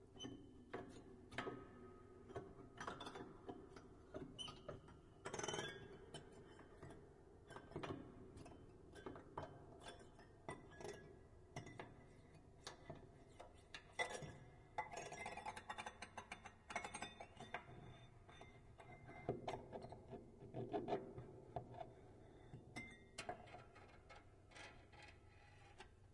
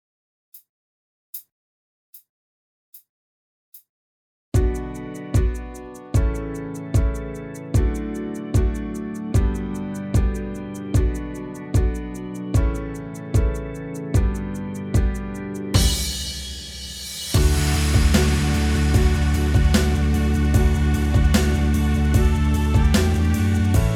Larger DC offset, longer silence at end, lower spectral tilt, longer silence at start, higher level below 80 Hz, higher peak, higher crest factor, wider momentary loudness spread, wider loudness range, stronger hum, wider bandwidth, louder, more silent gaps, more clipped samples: neither; about the same, 0 s vs 0 s; second, -4 dB/octave vs -5.5 dB/octave; second, 0 s vs 0.55 s; second, -70 dBFS vs -24 dBFS; second, -28 dBFS vs -4 dBFS; first, 26 dB vs 18 dB; about the same, 15 LU vs 13 LU; about the same, 7 LU vs 7 LU; neither; second, 11.5 kHz vs 17.5 kHz; second, -55 LUFS vs -22 LUFS; second, none vs 0.69-1.33 s, 1.52-2.13 s, 2.29-2.93 s, 3.09-3.72 s, 3.89-4.52 s; neither